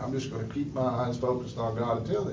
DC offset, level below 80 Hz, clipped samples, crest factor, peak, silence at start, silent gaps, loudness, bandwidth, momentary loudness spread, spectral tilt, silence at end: under 0.1%; -52 dBFS; under 0.1%; 14 dB; -16 dBFS; 0 s; none; -31 LUFS; 7.6 kHz; 4 LU; -7.5 dB/octave; 0 s